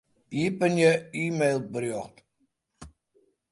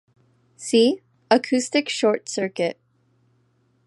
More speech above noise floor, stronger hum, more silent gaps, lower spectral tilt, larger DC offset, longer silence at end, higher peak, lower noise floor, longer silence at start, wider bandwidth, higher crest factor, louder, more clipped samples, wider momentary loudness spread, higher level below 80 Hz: first, 48 dB vs 44 dB; second, none vs 60 Hz at -50 dBFS; neither; first, -6 dB/octave vs -3.5 dB/octave; neither; second, 0.65 s vs 1.15 s; second, -8 dBFS vs -2 dBFS; first, -74 dBFS vs -64 dBFS; second, 0.3 s vs 0.6 s; about the same, 11.5 kHz vs 11.5 kHz; about the same, 20 dB vs 22 dB; second, -26 LUFS vs -22 LUFS; neither; first, 13 LU vs 9 LU; first, -62 dBFS vs -78 dBFS